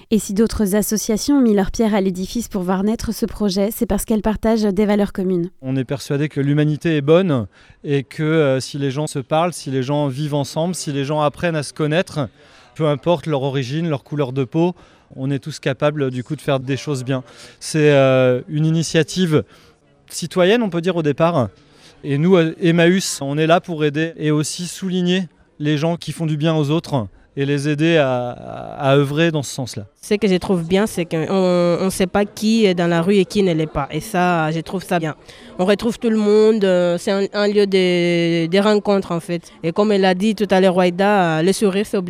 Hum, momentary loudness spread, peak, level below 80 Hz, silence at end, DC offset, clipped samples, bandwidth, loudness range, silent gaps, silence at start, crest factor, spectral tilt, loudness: none; 9 LU; -2 dBFS; -44 dBFS; 0 s; under 0.1%; under 0.1%; 16.5 kHz; 4 LU; none; 0.1 s; 16 dB; -6 dB/octave; -18 LUFS